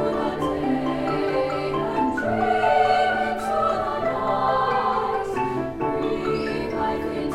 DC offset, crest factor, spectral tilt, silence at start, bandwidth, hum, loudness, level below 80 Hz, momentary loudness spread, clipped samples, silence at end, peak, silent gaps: under 0.1%; 16 dB; -6 dB/octave; 0 s; 15 kHz; none; -23 LUFS; -46 dBFS; 6 LU; under 0.1%; 0 s; -8 dBFS; none